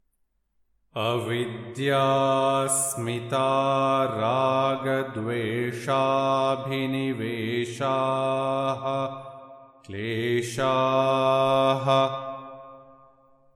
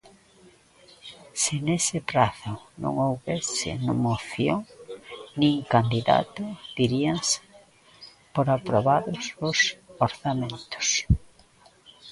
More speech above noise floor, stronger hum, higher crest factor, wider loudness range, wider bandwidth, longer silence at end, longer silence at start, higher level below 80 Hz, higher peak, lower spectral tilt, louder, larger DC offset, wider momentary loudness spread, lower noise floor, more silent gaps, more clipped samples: first, 47 dB vs 32 dB; neither; second, 16 dB vs 22 dB; about the same, 4 LU vs 2 LU; first, 17.5 kHz vs 11.5 kHz; first, 0.75 s vs 0 s; about the same, 0.95 s vs 1.05 s; second, -70 dBFS vs -44 dBFS; second, -10 dBFS vs -4 dBFS; about the same, -4.5 dB/octave vs -4 dB/octave; about the same, -25 LUFS vs -25 LUFS; neither; second, 11 LU vs 14 LU; first, -72 dBFS vs -56 dBFS; neither; neither